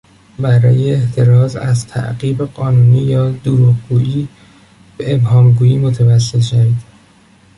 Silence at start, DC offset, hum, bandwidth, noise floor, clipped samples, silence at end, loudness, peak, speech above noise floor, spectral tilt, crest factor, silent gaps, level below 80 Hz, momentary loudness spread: 0.4 s; under 0.1%; none; 11 kHz; -46 dBFS; under 0.1%; 0.75 s; -13 LUFS; -2 dBFS; 35 dB; -7.5 dB/octave; 10 dB; none; -42 dBFS; 9 LU